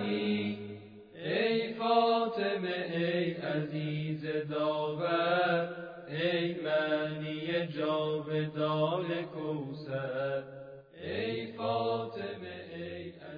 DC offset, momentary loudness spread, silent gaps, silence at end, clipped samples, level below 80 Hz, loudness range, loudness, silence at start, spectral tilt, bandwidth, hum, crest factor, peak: under 0.1%; 13 LU; none; 0 s; under 0.1%; -72 dBFS; 5 LU; -33 LUFS; 0 s; -8.5 dB/octave; 5.2 kHz; none; 18 dB; -14 dBFS